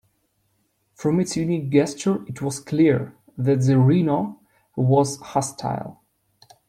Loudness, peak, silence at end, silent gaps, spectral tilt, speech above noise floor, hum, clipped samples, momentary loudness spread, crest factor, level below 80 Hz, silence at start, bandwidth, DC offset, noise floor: -22 LUFS; -6 dBFS; 0.75 s; none; -7 dB/octave; 48 dB; none; under 0.1%; 11 LU; 18 dB; -60 dBFS; 1 s; 13.5 kHz; under 0.1%; -69 dBFS